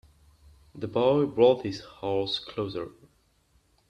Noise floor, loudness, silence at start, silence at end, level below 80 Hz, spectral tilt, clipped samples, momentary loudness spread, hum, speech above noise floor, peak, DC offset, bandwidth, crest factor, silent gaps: -66 dBFS; -27 LUFS; 0.75 s; 1 s; -60 dBFS; -7 dB/octave; under 0.1%; 15 LU; none; 40 dB; -8 dBFS; under 0.1%; 9 kHz; 20 dB; none